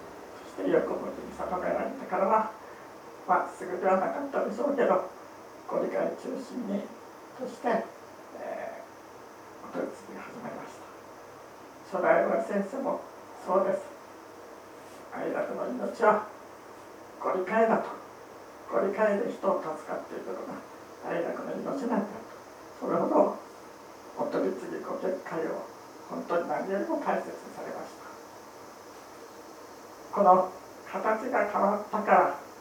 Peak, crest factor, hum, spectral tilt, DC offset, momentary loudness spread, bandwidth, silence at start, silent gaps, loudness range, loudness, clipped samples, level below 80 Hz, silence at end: -6 dBFS; 24 dB; none; -6 dB/octave; under 0.1%; 22 LU; over 20 kHz; 0 s; none; 8 LU; -30 LUFS; under 0.1%; -72 dBFS; 0 s